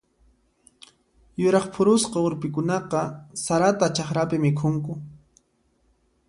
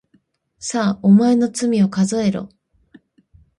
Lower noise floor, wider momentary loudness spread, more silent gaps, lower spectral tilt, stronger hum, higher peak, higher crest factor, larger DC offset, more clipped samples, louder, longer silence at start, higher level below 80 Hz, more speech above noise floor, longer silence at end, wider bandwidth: first, -67 dBFS vs -61 dBFS; second, 12 LU vs 15 LU; neither; about the same, -5.5 dB/octave vs -6 dB/octave; neither; about the same, -6 dBFS vs -4 dBFS; about the same, 20 dB vs 16 dB; neither; neither; second, -23 LUFS vs -17 LUFS; first, 1.4 s vs 0.6 s; about the same, -58 dBFS vs -58 dBFS; about the same, 44 dB vs 45 dB; about the same, 1.15 s vs 1.15 s; about the same, 11.5 kHz vs 11.5 kHz